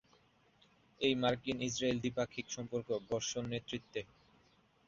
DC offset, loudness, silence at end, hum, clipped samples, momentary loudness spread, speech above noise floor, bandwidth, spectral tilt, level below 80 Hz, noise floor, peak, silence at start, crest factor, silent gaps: under 0.1%; -38 LUFS; 0.8 s; none; under 0.1%; 9 LU; 33 dB; 7.6 kHz; -4 dB/octave; -68 dBFS; -70 dBFS; -18 dBFS; 1 s; 22 dB; none